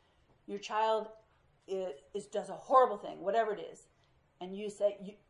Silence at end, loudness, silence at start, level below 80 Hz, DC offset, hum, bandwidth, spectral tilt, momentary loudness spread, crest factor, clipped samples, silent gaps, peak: 0.15 s; -34 LUFS; 0.5 s; -76 dBFS; under 0.1%; none; 11.5 kHz; -4.5 dB/octave; 18 LU; 22 dB; under 0.1%; none; -12 dBFS